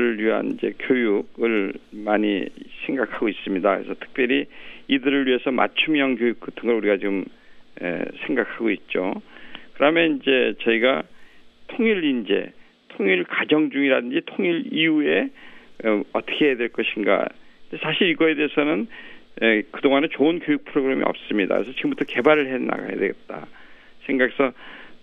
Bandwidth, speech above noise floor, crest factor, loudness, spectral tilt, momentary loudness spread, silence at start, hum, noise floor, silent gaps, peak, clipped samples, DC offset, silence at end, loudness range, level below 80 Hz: 4.5 kHz; 23 dB; 20 dB; -22 LUFS; -7.5 dB/octave; 12 LU; 0 s; none; -45 dBFS; none; -2 dBFS; under 0.1%; under 0.1%; 0.05 s; 3 LU; -60 dBFS